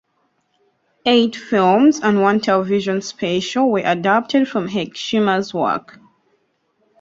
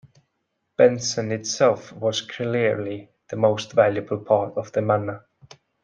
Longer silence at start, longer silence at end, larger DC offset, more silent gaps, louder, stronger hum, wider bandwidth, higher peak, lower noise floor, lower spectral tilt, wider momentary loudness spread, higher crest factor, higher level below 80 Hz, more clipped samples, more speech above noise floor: first, 1.05 s vs 0.8 s; first, 1.2 s vs 0.65 s; neither; neither; first, -17 LUFS vs -22 LUFS; neither; second, 7.8 kHz vs 9.4 kHz; about the same, -2 dBFS vs -2 dBFS; second, -66 dBFS vs -75 dBFS; about the same, -5 dB/octave vs -4.5 dB/octave; second, 8 LU vs 14 LU; about the same, 16 dB vs 20 dB; first, -60 dBFS vs -68 dBFS; neither; second, 49 dB vs 54 dB